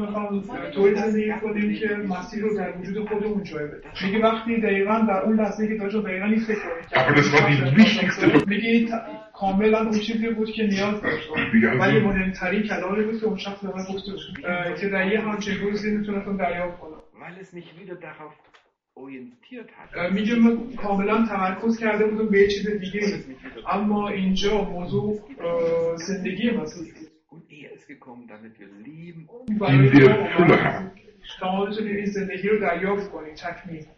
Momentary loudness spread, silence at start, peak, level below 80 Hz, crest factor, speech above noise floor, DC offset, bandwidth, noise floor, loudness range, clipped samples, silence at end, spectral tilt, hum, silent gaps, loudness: 21 LU; 0 s; -4 dBFS; -48 dBFS; 20 dB; 35 dB; under 0.1%; 7 kHz; -57 dBFS; 10 LU; under 0.1%; 0.15 s; -6.5 dB/octave; none; none; -22 LUFS